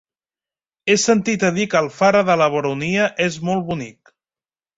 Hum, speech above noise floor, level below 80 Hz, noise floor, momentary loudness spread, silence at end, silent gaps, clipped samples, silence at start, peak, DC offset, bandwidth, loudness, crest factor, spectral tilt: none; over 72 dB; -56 dBFS; under -90 dBFS; 10 LU; 0.85 s; none; under 0.1%; 0.85 s; -2 dBFS; under 0.1%; 8 kHz; -18 LUFS; 18 dB; -4.5 dB/octave